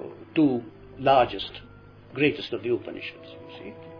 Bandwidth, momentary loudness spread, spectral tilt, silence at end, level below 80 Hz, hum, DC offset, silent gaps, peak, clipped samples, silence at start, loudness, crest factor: 5.4 kHz; 21 LU; -8 dB/octave; 0 s; -56 dBFS; none; under 0.1%; none; -8 dBFS; under 0.1%; 0 s; -26 LUFS; 20 dB